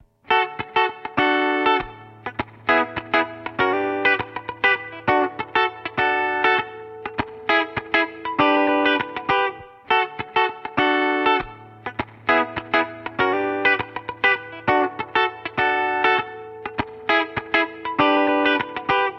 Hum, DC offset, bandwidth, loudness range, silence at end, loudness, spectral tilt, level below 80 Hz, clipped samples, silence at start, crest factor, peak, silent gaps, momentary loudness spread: none; under 0.1%; 6.6 kHz; 1 LU; 0 s; -21 LUFS; -6 dB/octave; -54 dBFS; under 0.1%; 0.3 s; 20 dB; -2 dBFS; none; 11 LU